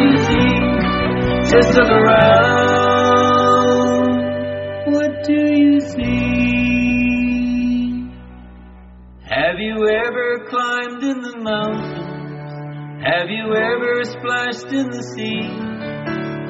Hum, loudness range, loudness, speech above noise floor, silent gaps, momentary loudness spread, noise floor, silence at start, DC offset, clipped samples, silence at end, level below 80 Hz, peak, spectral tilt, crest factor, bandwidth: none; 8 LU; -16 LUFS; 25 dB; none; 14 LU; -40 dBFS; 0 s; under 0.1%; under 0.1%; 0 s; -36 dBFS; 0 dBFS; -4 dB/octave; 16 dB; 7.8 kHz